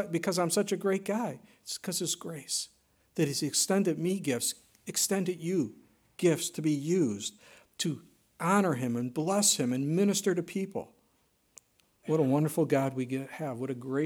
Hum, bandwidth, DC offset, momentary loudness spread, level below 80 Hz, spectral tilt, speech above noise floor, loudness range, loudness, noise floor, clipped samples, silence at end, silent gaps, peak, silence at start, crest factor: none; 18 kHz; under 0.1%; 11 LU; -76 dBFS; -4.5 dB/octave; 41 dB; 3 LU; -30 LUFS; -71 dBFS; under 0.1%; 0 s; none; -12 dBFS; 0 s; 20 dB